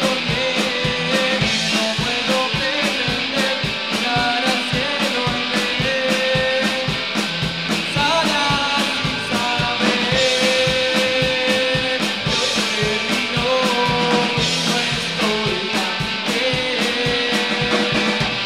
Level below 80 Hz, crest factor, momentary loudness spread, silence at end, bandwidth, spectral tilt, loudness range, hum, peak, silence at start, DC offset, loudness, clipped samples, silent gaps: -44 dBFS; 16 dB; 3 LU; 0 s; 16 kHz; -3.5 dB/octave; 2 LU; none; -2 dBFS; 0 s; 0.3%; -18 LUFS; under 0.1%; none